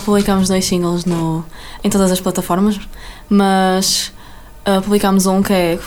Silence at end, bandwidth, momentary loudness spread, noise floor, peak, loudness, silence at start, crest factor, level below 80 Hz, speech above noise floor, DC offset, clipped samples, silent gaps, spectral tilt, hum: 0 s; 18 kHz; 11 LU; -35 dBFS; -2 dBFS; -15 LUFS; 0 s; 14 dB; -36 dBFS; 21 dB; under 0.1%; under 0.1%; none; -5 dB/octave; none